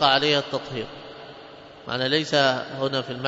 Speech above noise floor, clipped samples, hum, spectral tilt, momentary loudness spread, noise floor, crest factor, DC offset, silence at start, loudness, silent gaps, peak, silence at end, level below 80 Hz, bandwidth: 21 dB; under 0.1%; none; -4 dB/octave; 22 LU; -44 dBFS; 22 dB; under 0.1%; 0 s; -23 LUFS; none; -2 dBFS; 0 s; -62 dBFS; 7.8 kHz